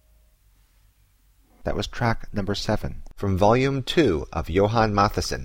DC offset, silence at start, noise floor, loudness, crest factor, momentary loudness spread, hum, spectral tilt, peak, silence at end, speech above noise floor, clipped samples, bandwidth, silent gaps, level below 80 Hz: under 0.1%; 1.65 s; -60 dBFS; -23 LUFS; 18 dB; 10 LU; none; -6 dB/octave; -6 dBFS; 0 s; 37 dB; under 0.1%; 16.5 kHz; none; -36 dBFS